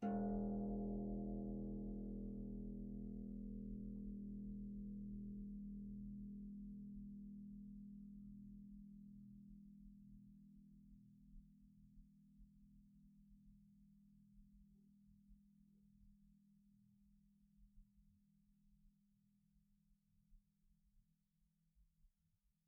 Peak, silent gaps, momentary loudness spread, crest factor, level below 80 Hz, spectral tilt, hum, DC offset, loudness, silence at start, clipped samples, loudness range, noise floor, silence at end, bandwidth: -34 dBFS; none; 22 LU; 20 dB; -62 dBFS; -6.5 dB/octave; none; under 0.1%; -51 LUFS; 0 s; under 0.1%; 19 LU; -84 dBFS; 0.6 s; 1.5 kHz